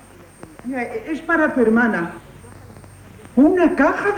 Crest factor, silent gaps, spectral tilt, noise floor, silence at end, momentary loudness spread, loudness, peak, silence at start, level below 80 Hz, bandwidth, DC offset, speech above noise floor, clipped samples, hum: 16 dB; none; -6.5 dB/octave; -42 dBFS; 0 s; 14 LU; -18 LUFS; -4 dBFS; 0.65 s; -48 dBFS; 11.5 kHz; under 0.1%; 25 dB; under 0.1%; none